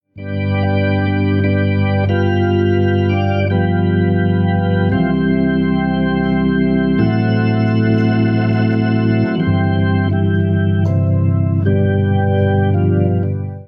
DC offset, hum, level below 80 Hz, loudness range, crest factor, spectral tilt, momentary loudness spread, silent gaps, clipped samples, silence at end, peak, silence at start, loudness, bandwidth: under 0.1%; none; -38 dBFS; 0 LU; 12 dB; -10.5 dB/octave; 2 LU; none; under 0.1%; 0 s; -2 dBFS; 0.15 s; -15 LUFS; 5.6 kHz